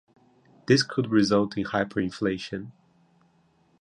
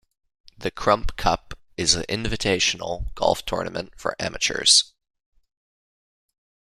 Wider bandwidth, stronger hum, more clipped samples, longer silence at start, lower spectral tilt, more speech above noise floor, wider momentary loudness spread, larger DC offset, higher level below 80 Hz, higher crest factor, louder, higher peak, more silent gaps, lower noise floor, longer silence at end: second, 10.5 kHz vs 15.5 kHz; neither; neither; about the same, 0.7 s vs 0.6 s; first, -5.5 dB/octave vs -2 dB/octave; second, 39 dB vs over 67 dB; about the same, 15 LU vs 15 LU; neither; second, -58 dBFS vs -40 dBFS; about the same, 22 dB vs 22 dB; second, -25 LUFS vs -22 LUFS; second, -6 dBFS vs -2 dBFS; neither; second, -64 dBFS vs under -90 dBFS; second, 1.1 s vs 1.85 s